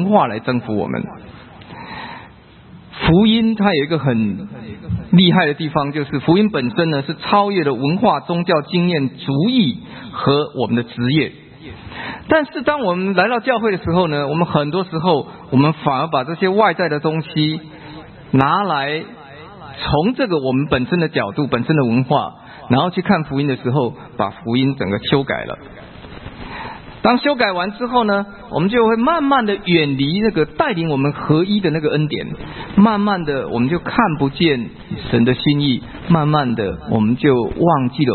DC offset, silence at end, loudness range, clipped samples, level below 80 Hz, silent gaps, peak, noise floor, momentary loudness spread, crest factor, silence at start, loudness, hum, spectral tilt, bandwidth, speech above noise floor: under 0.1%; 0 s; 4 LU; under 0.1%; -44 dBFS; none; 0 dBFS; -42 dBFS; 15 LU; 18 dB; 0 s; -17 LUFS; none; -10.5 dB/octave; 4.5 kHz; 25 dB